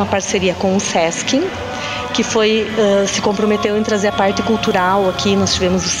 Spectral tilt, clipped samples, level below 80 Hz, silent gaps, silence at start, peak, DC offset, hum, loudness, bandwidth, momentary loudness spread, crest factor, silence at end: -4 dB/octave; under 0.1%; -42 dBFS; none; 0 s; -2 dBFS; under 0.1%; none; -16 LUFS; 15.5 kHz; 4 LU; 14 dB; 0 s